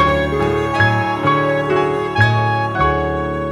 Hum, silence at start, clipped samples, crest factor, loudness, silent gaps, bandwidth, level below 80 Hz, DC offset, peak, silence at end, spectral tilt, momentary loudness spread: none; 0 s; under 0.1%; 16 dB; -16 LUFS; none; 11.5 kHz; -32 dBFS; under 0.1%; 0 dBFS; 0 s; -7 dB/octave; 3 LU